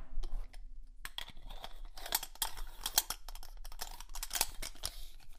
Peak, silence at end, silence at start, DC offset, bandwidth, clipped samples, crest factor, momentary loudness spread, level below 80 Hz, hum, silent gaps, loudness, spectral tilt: -10 dBFS; 0 s; 0 s; under 0.1%; 16 kHz; under 0.1%; 30 dB; 19 LU; -44 dBFS; none; none; -39 LUFS; 0 dB/octave